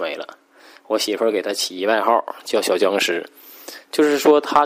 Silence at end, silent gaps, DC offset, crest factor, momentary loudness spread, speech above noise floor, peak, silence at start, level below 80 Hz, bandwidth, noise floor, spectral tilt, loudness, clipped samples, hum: 0 s; none; under 0.1%; 18 dB; 21 LU; 21 dB; 0 dBFS; 0 s; -70 dBFS; 16 kHz; -40 dBFS; -2.5 dB/octave; -19 LUFS; under 0.1%; none